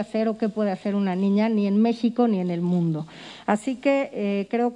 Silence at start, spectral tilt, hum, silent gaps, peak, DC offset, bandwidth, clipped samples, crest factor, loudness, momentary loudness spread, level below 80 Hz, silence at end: 0 s; -8 dB/octave; none; none; -6 dBFS; under 0.1%; 10.5 kHz; under 0.1%; 16 dB; -24 LUFS; 5 LU; -68 dBFS; 0 s